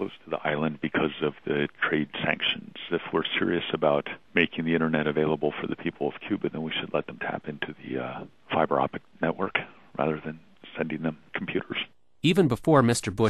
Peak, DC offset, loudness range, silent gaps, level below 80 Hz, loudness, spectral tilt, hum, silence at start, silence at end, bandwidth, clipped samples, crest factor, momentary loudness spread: -6 dBFS; 0.2%; 4 LU; none; -60 dBFS; -28 LUFS; -5.5 dB/octave; none; 0 s; 0 s; 13 kHz; under 0.1%; 20 dB; 10 LU